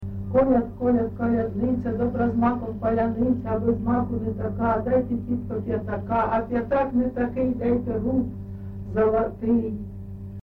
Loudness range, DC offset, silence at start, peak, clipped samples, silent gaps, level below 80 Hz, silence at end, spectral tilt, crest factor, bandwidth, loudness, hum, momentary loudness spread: 2 LU; under 0.1%; 0 s; -10 dBFS; under 0.1%; none; -42 dBFS; 0 s; -11 dB/octave; 14 dB; 4.1 kHz; -24 LUFS; none; 6 LU